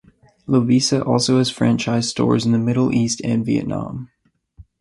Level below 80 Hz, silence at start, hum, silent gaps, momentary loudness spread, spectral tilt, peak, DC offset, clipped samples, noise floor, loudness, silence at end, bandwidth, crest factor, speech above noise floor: -50 dBFS; 0.5 s; none; none; 10 LU; -5.5 dB/octave; -2 dBFS; under 0.1%; under 0.1%; -48 dBFS; -18 LUFS; 0.2 s; 11.5 kHz; 18 dB; 30 dB